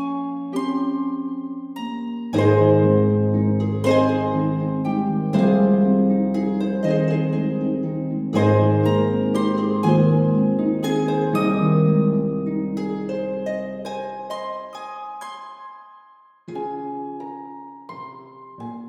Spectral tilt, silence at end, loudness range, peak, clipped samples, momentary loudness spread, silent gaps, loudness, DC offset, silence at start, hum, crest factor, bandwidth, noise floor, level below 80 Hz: -8.5 dB/octave; 0 s; 14 LU; -4 dBFS; under 0.1%; 17 LU; none; -21 LUFS; under 0.1%; 0 s; none; 18 dB; 12 kHz; -51 dBFS; -56 dBFS